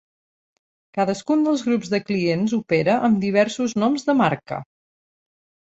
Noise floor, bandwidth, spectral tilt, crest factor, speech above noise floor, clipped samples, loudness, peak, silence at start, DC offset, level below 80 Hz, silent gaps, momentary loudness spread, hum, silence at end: under -90 dBFS; 8 kHz; -6 dB/octave; 18 dB; over 70 dB; under 0.1%; -21 LUFS; -4 dBFS; 0.95 s; under 0.1%; -62 dBFS; none; 6 LU; none; 1.15 s